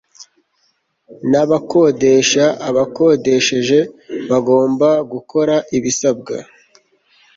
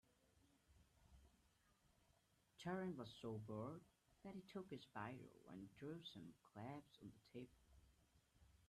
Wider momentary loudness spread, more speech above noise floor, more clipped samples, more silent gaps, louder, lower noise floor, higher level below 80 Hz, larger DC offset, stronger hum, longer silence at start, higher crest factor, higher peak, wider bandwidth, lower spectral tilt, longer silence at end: about the same, 11 LU vs 12 LU; first, 49 dB vs 26 dB; neither; neither; first, -15 LUFS vs -56 LUFS; second, -63 dBFS vs -81 dBFS; first, -58 dBFS vs -80 dBFS; neither; neither; about the same, 0.2 s vs 0.25 s; second, 14 dB vs 20 dB; first, -2 dBFS vs -36 dBFS; second, 7.8 kHz vs 13 kHz; second, -4 dB/octave vs -6.5 dB/octave; first, 0.95 s vs 0 s